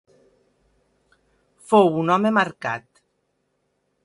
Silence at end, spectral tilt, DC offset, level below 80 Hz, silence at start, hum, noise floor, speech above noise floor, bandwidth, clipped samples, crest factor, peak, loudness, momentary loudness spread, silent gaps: 1.25 s; -6.5 dB/octave; under 0.1%; -68 dBFS; 1.7 s; none; -72 dBFS; 53 dB; 11.5 kHz; under 0.1%; 22 dB; -2 dBFS; -20 LUFS; 12 LU; none